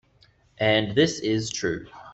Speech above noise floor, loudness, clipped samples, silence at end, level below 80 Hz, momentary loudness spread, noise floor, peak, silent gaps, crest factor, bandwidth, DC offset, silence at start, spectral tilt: 36 dB; -24 LUFS; under 0.1%; 0 s; -56 dBFS; 8 LU; -60 dBFS; -8 dBFS; none; 18 dB; 8.4 kHz; under 0.1%; 0.6 s; -4.5 dB/octave